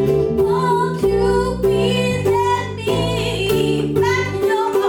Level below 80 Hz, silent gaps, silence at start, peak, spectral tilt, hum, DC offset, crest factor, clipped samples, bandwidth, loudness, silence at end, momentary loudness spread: -36 dBFS; none; 0 s; -6 dBFS; -6 dB/octave; none; under 0.1%; 10 dB; under 0.1%; 17.5 kHz; -18 LUFS; 0 s; 3 LU